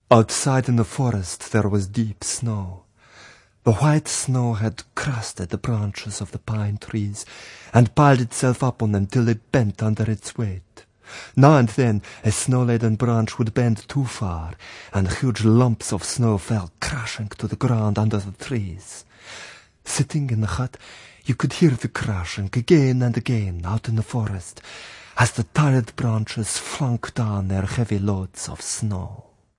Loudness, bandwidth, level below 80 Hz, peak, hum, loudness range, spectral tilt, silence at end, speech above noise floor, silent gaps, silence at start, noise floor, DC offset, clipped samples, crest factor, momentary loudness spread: -22 LUFS; 11.5 kHz; -48 dBFS; 0 dBFS; none; 5 LU; -6 dB/octave; 0.4 s; 27 dB; none; 0.1 s; -48 dBFS; under 0.1%; under 0.1%; 22 dB; 15 LU